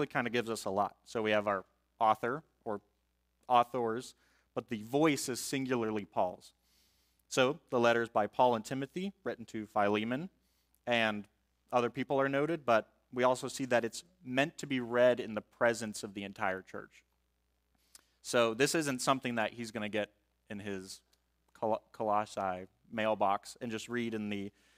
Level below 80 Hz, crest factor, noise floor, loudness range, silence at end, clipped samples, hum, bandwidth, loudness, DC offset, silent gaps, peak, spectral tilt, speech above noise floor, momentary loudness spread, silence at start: -74 dBFS; 22 dB; -78 dBFS; 4 LU; 0.3 s; under 0.1%; 60 Hz at -70 dBFS; 16 kHz; -34 LUFS; under 0.1%; none; -14 dBFS; -4.5 dB/octave; 45 dB; 13 LU; 0 s